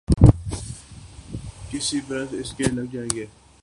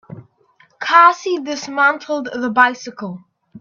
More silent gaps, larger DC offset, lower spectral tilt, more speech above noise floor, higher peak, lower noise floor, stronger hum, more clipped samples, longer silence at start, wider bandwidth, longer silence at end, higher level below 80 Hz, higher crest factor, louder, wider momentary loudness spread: neither; neither; first, -5.5 dB/octave vs -3.5 dB/octave; second, 15 dB vs 39 dB; about the same, 0 dBFS vs 0 dBFS; second, -42 dBFS vs -55 dBFS; neither; neither; about the same, 0.1 s vs 0.1 s; first, 11.5 kHz vs 7.4 kHz; first, 0.35 s vs 0 s; first, -32 dBFS vs -68 dBFS; about the same, 22 dB vs 18 dB; second, -23 LUFS vs -15 LUFS; first, 23 LU vs 19 LU